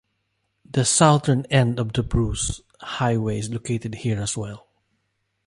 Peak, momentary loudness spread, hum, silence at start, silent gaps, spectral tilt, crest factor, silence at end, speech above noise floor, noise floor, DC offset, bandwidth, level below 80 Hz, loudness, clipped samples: -4 dBFS; 14 LU; none; 0.75 s; none; -5 dB/octave; 20 dB; 0.9 s; 52 dB; -73 dBFS; under 0.1%; 11.5 kHz; -40 dBFS; -22 LUFS; under 0.1%